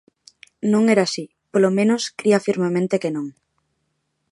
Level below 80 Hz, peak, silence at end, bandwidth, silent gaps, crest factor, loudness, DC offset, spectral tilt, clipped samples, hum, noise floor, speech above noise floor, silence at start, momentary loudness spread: -70 dBFS; -4 dBFS; 1 s; 11.5 kHz; none; 18 dB; -20 LUFS; under 0.1%; -5.5 dB/octave; under 0.1%; none; -72 dBFS; 54 dB; 0.65 s; 10 LU